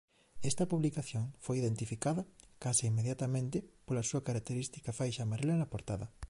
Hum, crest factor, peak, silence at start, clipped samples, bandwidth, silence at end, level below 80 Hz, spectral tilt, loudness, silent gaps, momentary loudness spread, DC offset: none; 18 dB; -18 dBFS; 0.2 s; under 0.1%; 11.5 kHz; 0.05 s; -58 dBFS; -5.5 dB/octave; -36 LUFS; none; 8 LU; under 0.1%